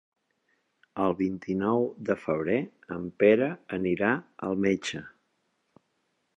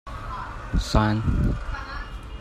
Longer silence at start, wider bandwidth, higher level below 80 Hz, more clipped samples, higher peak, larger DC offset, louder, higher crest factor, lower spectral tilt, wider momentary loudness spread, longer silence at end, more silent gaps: first, 0.95 s vs 0.05 s; second, 9 kHz vs 13.5 kHz; second, -62 dBFS vs -30 dBFS; neither; second, -8 dBFS vs -4 dBFS; neither; about the same, -28 LUFS vs -27 LUFS; about the same, 20 dB vs 22 dB; about the same, -6.5 dB/octave vs -6.5 dB/octave; about the same, 14 LU vs 13 LU; first, 1.3 s vs 0 s; neither